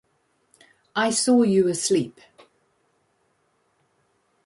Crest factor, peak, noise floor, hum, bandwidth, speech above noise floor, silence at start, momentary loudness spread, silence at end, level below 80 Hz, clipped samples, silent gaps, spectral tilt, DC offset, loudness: 16 dB; -10 dBFS; -68 dBFS; none; 11.5 kHz; 48 dB; 0.95 s; 11 LU; 2.35 s; -70 dBFS; under 0.1%; none; -4 dB/octave; under 0.1%; -21 LUFS